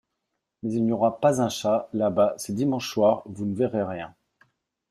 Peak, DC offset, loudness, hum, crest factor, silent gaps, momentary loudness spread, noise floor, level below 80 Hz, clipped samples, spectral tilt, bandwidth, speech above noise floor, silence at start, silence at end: -8 dBFS; under 0.1%; -25 LUFS; none; 18 dB; none; 9 LU; -81 dBFS; -64 dBFS; under 0.1%; -6 dB/octave; 14 kHz; 57 dB; 0.65 s; 0.8 s